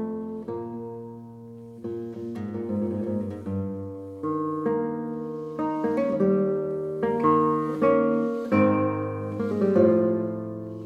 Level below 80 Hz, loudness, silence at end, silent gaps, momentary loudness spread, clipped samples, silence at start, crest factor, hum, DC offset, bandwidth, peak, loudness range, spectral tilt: -66 dBFS; -26 LUFS; 0 s; none; 14 LU; under 0.1%; 0 s; 18 dB; none; under 0.1%; 7.2 kHz; -8 dBFS; 9 LU; -10 dB/octave